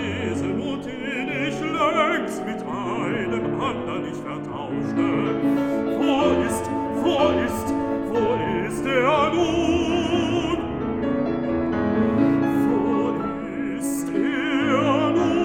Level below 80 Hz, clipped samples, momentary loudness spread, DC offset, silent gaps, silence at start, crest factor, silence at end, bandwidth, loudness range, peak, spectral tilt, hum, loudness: -48 dBFS; under 0.1%; 8 LU; under 0.1%; none; 0 s; 16 dB; 0 s; 16 kHz; 3 LU; -6 dBFS; -6 dB/octave; none; -23 LUFS